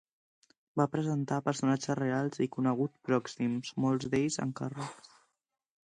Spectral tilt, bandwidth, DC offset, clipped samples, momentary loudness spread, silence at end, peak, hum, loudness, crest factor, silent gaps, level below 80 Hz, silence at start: -6 dB/octave; 10.5 kHz; under 0.1%; under 0.1%; 7 LU; 0.9 s; -14 dBFS; none; -32 LUFS; 20 dB; none; -70 dBFS; 0.75 s